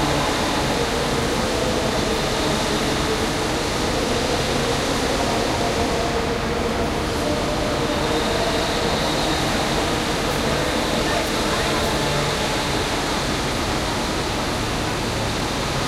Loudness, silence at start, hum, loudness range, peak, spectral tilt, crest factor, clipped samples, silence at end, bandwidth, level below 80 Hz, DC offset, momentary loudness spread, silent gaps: -21 LUFS; 0 s; none; 1 LU; -6 dBFS; -4 dB/octave; 14 dB; under 0.1%; 0 s; 16 kHz; -34 dBFS; under 0.1%; 2 LU; none